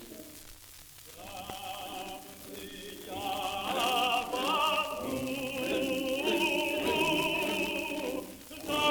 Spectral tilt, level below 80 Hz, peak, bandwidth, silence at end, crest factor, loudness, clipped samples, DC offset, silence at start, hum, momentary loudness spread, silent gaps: -3 dB/octave; -60 dBFS; -14 dBFS; over 20 kHz; 0 s; 18 dB; -31 LUFS; under 0.1%; under 0.1%; 0 s; none; 18 LU; none